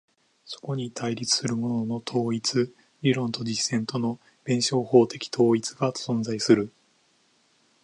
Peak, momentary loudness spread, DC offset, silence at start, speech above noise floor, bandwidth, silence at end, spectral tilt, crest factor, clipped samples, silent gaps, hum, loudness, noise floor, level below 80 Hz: -6 dBFS; 11 LU; under 0.1%; 0.45 s; 40 dB; 11 kHz; 1.15 s; -4.5 dB/octave; 22 dB; under 0.1%; none; none; -25 LUFS; -65 dBFS; -68 dBFS